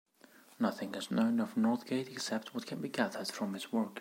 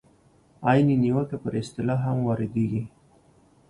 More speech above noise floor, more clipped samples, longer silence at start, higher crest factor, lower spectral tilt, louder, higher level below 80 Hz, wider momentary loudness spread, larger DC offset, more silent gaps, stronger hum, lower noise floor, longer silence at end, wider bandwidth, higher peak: second, 27 dB vs 35 dB; neither; about the same, 0.6 s vs 0.6 s; about the same, 20 dB vs 20 dB; second, -5 dB/octave vs -8.5 dB/octave; second, -35 LUFS vs -25 LUFS; second, -88 dBFS vs -56 dBFS; second, 7 LU vs 10 LU; neither; neither; neither; about the same, -61 dBFS vs -59 dBFS; second, 0 s vs 0.8 s; first, 16.5 kHz vs 11 kHz; second, -16 dBFS vs -6 dBFS